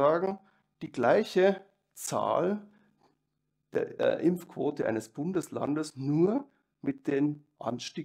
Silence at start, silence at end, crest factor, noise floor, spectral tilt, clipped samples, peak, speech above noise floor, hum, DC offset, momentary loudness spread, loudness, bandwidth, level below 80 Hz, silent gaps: 0 s; 0 s; 20 dB; -80 dBFS; -6 dB/octave; under 0.1%; -10 dBFS; 52 dB; none; under 0.1%; 12 LU; -30 LUFS; 16 kHz; -76 dBFS; none